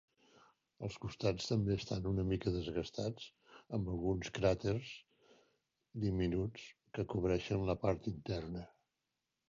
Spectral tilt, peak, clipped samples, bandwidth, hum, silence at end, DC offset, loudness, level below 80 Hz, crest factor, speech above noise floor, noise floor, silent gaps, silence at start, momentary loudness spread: -6.5 dB/octave; -20 dBFS; under 0.1%; 7.4 kHz; none; 0.8 s; under 0.1%; -39 LUFS; -54 dBFS; 20 dB; 51 dB; -88 dBFS; none; 0.8 s; 13 LU